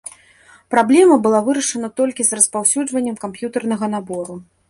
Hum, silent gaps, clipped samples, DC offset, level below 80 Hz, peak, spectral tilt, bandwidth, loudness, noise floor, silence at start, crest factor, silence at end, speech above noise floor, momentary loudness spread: none; none; under 0.1%; under 0.1%; -62 dBFS; 0 dBFS; -3.5 dB/octave; 11.5 kHz; -16 LUFS; -49 dBFS; 0.05 s; 18 dB; 0.3 s; 32 dB; 15 LU